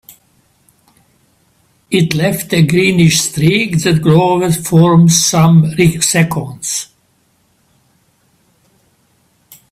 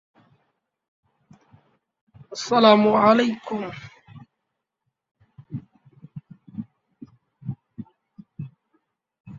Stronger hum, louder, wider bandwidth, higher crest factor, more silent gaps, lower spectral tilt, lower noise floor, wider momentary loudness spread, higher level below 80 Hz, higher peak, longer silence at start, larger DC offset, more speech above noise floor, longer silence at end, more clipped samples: neither; first, -11 LUFS vs -19 LUFS; first, 15 kHz vs 7.6 kHz; second, 14 dB vs 24 dB; second, none vs 9.20-9.24 s; about the same, -5 dB/octave vs -5.5 dB/octave; second, -57 dBFS vs -81 dBFS; second, 10 LU vs 28 LU; first, -46 dBFS vs -66 dBFS; about the same, 0 dBFS vs -2 dBFS; second, 1.9 s vs 2.3 s; neither; second, 46 dB vs 62 dB; first, 2.85 s vs 0 s; neither